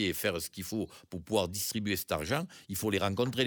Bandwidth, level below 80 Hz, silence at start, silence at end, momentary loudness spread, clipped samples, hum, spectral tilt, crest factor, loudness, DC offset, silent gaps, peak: over 20 kHz; -58 dBFS; 0 s; 0 s; 7 LU; under 0.1%; none; -4 dB/octave; 20 dB; -33 LUFS; under 0.1%; none; -14 dBFS